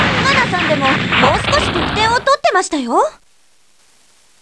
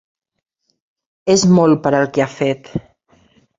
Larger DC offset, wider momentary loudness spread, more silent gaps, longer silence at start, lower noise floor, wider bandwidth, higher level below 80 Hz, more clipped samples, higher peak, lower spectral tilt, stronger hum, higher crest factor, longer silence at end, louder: first, 0.2% vs under 0.1%; second, 4 LU vs 14 LU; neither; second, 0 s vs 1.25 s; about the same, -56 dBFS vs -55 dBFS; first, 11 kHz vs 8 kHz; first, -36 dBFS vs -52 dBFS; neither; about the same, 0 dBFS vs 0 dBFS; second, -4 dB/octave vs -5.5 dB/octave; neither; about the same, 16 dB vs 18 dB; first, 1.3 s vs 0.8 s; about the same, -14 LUFS vs -15 LUFS